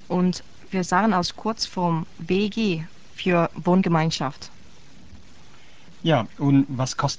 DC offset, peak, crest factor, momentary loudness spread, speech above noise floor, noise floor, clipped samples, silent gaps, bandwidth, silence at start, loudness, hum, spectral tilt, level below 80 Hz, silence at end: 1%; -6 dBFS; 18 dB; 10 LU; 28 dB; -51 dBFS; under 0.1%; none; 8 kHz; 0.1 s; -23 LUFS; none; -6 dB/octave; -54 dBFS; 0 s